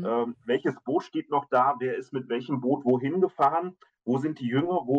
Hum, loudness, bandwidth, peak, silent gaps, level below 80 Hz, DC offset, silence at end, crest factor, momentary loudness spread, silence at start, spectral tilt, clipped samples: none; -27 LUFS; 7.8 kHz; -12 dBFS; none; -74 dBFS; under 0.1%; 0 s; 16 dB; 8 LU; 0 s; -8 dB/octave; under 0.1%